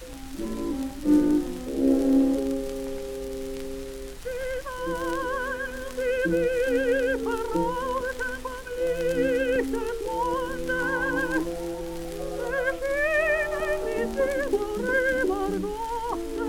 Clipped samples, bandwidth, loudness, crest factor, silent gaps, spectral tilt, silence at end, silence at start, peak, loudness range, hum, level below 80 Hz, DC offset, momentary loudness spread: under 0.1%; 18.5 kHz; -27 LUFS; 16 dB; none; -5 dB/octave; 0 s; 0 s; -10 dBFS; 4 LU; none; -42 dBFS; under 0.1%; 11 LU